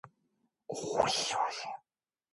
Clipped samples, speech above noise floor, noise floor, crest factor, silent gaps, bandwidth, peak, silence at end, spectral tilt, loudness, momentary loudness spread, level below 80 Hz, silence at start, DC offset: under 0.1%; 57 dB; -90 dBFS; 24 dB; none; 12 kHz; -12 dBFS; 0.55 s; -2 dB/octave; -33 LUFS; 14 LU; -68 dBFS; 0.05 s; under 0.1%